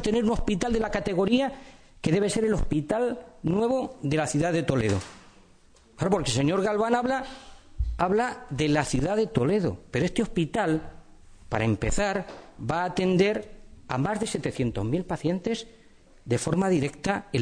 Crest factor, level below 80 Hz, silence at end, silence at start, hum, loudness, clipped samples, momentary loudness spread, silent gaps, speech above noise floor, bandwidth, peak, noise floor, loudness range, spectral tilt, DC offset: 18 dB; -40 dBFS; 0 s; 0 s; none; -27 LUFS; under 0.1%; 8 LU; none; 31 dB; 10.5 kHz; -10 dBFS; -56 dBFS; 2 LU; -5.5 dB/octave; under 0.1%